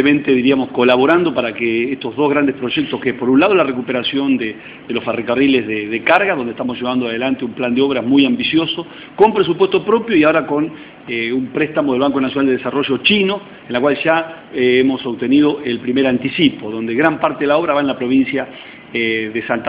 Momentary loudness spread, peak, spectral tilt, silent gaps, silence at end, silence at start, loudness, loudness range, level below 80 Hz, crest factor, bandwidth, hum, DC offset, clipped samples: 8 LU; 0 dBFS; -8.5 dB/octave; none; 0 s; 0 s; -16 LUFS; 2 LU; -54 dBFS; 16 dB; 5.2 kHz; none; under 0.1%; under 0.1%